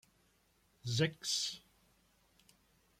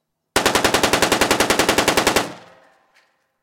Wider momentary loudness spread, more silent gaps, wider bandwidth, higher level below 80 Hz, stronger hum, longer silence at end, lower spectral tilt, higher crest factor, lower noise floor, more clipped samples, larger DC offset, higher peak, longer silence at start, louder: first, 14 LU vs 6 LU; neither; about the same, 16 kHz vs 17 kHz; second, -72 dBFS vs -44 dBFS; neither; first, 1.4 s vs 1.05 s; first, -3.5 dB/octave vs -2 dB/octave; first, 22 dB vs 16 dB; first, -73 dBFS vs -61 dBFS; neither; neither; second, -20 dBFS vs -4 dBFS; first, 0.85 s vs 0.35 s; second, -36 LUFS vs -17 LUFS